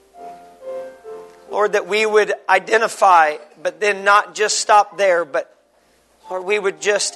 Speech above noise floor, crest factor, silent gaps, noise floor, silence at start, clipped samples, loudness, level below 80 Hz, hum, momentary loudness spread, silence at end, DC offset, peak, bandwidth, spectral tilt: 41 dB; 18 dB; none; -57 dBFS; 0.2 s; under 0.1%; -17 LUFS; -70 dBFS; none; 19 LU; 0 s; under 0.1%; 0 dBFS; 12.5 kHz; -1 dB/octave